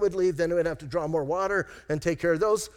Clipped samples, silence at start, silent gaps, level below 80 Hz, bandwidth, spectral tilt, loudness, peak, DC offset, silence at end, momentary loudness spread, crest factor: under 0.1%; 0 s; none; -52 dBFS; 16.5 kHz; -5.5 dB/octave; -27 LUFS; -14 dBFS; under 0.1%; 0.05 s; 5 LU; 12 dB